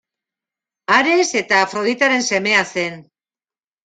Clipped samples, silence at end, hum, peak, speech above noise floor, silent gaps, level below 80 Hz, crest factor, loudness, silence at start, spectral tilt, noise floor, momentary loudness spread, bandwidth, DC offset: under 0.1%; 0.85 s; none; 0 dBFS; over 73 dB; none; -64 dBFS; 18 dB; -16 LUFS; 0.9 s; -2.5 dB/octave; under -90 dBFS; 9 LU; 9.4 kHz; under 0.1%